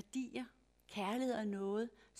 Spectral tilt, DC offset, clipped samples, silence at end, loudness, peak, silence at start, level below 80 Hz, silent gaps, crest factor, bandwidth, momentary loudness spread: -5.5 dB/octave; under 0.1%; under 0.1%; 0 s; -41 LUFS; -26 dBFS; 0.15 s; -76 dBFS; none; 16 dB; 15 kHz; 10 LU